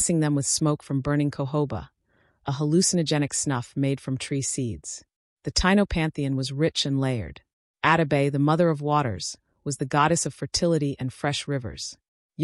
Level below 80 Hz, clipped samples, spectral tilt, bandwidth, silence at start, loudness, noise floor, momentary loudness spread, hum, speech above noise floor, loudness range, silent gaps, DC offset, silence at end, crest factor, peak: -46 dBFS; under 0.1%; -4.5 dB/octave; 12 kHz; 0 s; -25 LUFS; -66 dBFS; 12 LU; none; 42 dB; 2 LU; 5.16-5.37 s, 7.53-7.74 s, 12.08-12.29 s; under 0.1%; 0 s; 18 dB; -6 dBFS